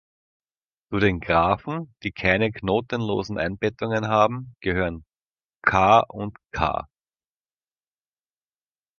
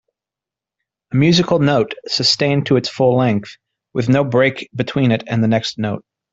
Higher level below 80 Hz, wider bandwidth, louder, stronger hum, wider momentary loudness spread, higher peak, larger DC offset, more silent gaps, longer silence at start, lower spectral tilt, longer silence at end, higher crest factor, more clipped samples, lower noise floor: first, -46 dBFS vs -54 dBFS; second, 7 kHz vs 7.8 kHz; second, -23 LUFS vs -16 LUFS; neither; first, 13 LU vs 9 LU; about the same, -2 dBFS vs -2 dBFS; neither; first, 5.22-5.35 s, 5.44-5.49 s, 5.55-5.60 s vs none; second, 0.9 s vs 1.1 s; about the same, -6.5 dB/octave vs -6 dB/octave; first, 2.15 s vs 0.35 s; first, 22 dB vs 14 dB; neither; about the same, under -90 dBFS vs -87 dBFS